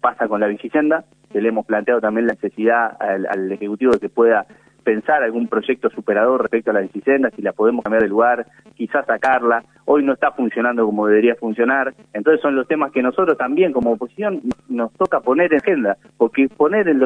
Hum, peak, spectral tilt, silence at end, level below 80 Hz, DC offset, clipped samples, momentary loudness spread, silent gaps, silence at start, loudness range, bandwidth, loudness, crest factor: none; -2 dBFS; -7.5 dB/octave; 0 s; -58 dBFS; under 0.1%; under 0.1%; 7 LU; none; 0 s; 2 LU; 9.4 kHz; -18 LUFS; 16 dB